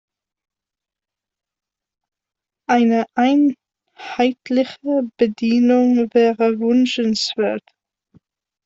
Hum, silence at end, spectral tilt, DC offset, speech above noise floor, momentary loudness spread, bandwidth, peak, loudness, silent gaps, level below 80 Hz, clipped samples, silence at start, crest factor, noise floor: none; 1.05 s; -5 dB/octave; under 0.1%; 71 dB; 7 LU; 7.8 kHz; -2 dBFS; -17 LUFS; none; -64 dBFS; under 0.1%; 2.7 s; 16 dB; -87 dBFS